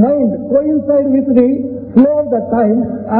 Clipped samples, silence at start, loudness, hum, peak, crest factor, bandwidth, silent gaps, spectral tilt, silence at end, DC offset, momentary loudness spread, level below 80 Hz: 0.1%; 0 s; -13 LUFS; none; 0 dBFS; 12 dB; 3.4 kHz; none; -13.5 dB/octave; 0 s; under 0.1%; 4 LU; -48 dBFS